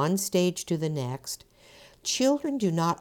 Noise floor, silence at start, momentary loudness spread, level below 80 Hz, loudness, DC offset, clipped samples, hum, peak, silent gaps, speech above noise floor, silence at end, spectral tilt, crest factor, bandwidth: -54 dBFS; 0 s; 11 LU; -66 dBFS; -28 LUFS; under 0.1%; under 0.1%; none; -12 dBFS; none; 27 dB; 0.05 s; -5 dB/octave; 16 dB; 19 kHz